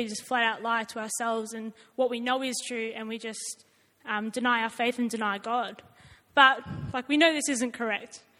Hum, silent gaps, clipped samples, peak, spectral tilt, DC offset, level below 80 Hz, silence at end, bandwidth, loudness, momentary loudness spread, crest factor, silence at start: none; none; under 0.1%; -4 dBFS; -2.5 dB/octave; under 0.1%; -66 dBFS; 0.2 s; 16.5 kHz; -28 LUFS; 14 LU; 24 dB; 0 s